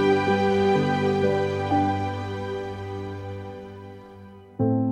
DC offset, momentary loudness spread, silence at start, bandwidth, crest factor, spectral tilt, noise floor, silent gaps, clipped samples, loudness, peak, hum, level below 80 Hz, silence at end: under 0.1%; 21 LU; 0 s; 9.8 kHz; 16 dB; -7.5 dB/octave; -45 dBFS; none; under 0.1%; -24 LUFS; -8 dBFS; none; -58 dBFS; 0 s